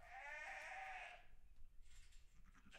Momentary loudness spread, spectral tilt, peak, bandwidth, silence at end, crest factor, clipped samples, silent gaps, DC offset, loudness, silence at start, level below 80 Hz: 18 LU; -2 dB/octave; -40 dBFS; 14 kHz; 0 s; 16 dB; under 0.1%; none; under 0.1%; -53 LUFS; 0 s; -66 dBFS